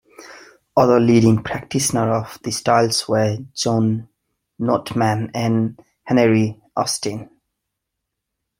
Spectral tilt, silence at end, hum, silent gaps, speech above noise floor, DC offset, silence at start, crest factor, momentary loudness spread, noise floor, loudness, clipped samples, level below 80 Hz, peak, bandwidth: -5.5 dB/octave; 1.35 s; none; none; 62 dB; under 0.1%; 0.2 s; 18 dB; 10 LU; -80 dBFS; -19 LUFS; under 0.1%; -54 dBFS; 0 dBFS; 16.5 kHz